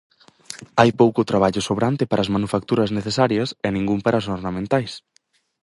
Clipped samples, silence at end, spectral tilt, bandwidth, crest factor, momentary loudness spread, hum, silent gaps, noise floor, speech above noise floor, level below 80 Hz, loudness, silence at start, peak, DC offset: under 0.1%; 0.65 s; -6 dB/octave; 11.5 kHz; 20 dB; 9 LU; none; none; -41 dBFS; 21 dB; -50 dBFS; -20 LUFS; 0.5 s; 0 dBFS; under 0.1%